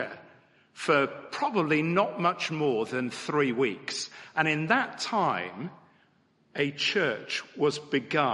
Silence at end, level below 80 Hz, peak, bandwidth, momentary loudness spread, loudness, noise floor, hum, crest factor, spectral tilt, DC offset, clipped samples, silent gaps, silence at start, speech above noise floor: 0 s; -76 dBFS; -8 dBFS; 11.5 kHz; 9 LU; -28 LUFS; -66 dBFS; none; 20 dB; -4.5 dB/octave; under 0.1%; under 0.1%; none; 0 s; 38 dB